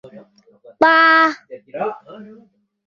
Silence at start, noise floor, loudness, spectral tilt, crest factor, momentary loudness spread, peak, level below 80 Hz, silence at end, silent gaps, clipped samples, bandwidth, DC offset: 0.15 s; -51 dBFS; -14 LUFS; -4 dB/octave; 18 dB; 23 LU; -2 dBFS; -68 dBFS; 0.65 s; none; under 0.1%; 7.2 kHz; under 0.1%